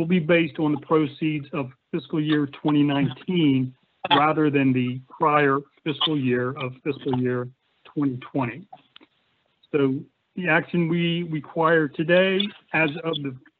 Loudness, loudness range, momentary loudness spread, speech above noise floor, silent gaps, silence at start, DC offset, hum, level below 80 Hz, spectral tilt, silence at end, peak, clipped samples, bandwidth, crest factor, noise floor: -23 LUFS; 6 LU; 11 LU; 46 dB; none; 0 s; under 0.1%; none; -66 dBFS; -4.5 dB/octave; 0.2 s; -4 dBFS; under 0.1%; 4.6 kHz; 18 dB; -68 dBFS